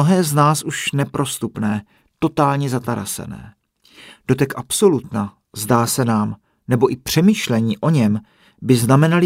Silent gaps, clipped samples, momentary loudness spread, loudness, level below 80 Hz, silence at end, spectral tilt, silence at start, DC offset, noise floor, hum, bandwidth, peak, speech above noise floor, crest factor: none; under 0.1%; 12 LU; -18 LUFS; -52 dBFS; 0 s; -5.5 dB/octave; 0 s; under 0.1%; -46 dBFS; none; 16 kHz; 0 dBFS; 29 dB; 18 dB